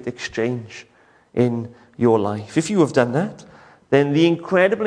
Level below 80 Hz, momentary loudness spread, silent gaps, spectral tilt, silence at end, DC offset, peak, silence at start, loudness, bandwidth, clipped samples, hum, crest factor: -60 dBFS; 12 LU; none; -6.5 dB/octave; 0 s; under 0.1%; -2 dBFS; 0 s; -20 LUFS; 10.5 kHz; under 0.1%; none; 18 dB